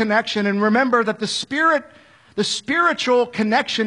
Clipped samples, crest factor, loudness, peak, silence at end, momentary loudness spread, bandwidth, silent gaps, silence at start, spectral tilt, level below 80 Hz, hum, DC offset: under 0.1%; 16 dB; -19 LUFS; -4 dBFS; 0 s; 6 LU; 11 kHz; none; 0 s; -4 dB/octave; -64 dBFS; none; under 0.1%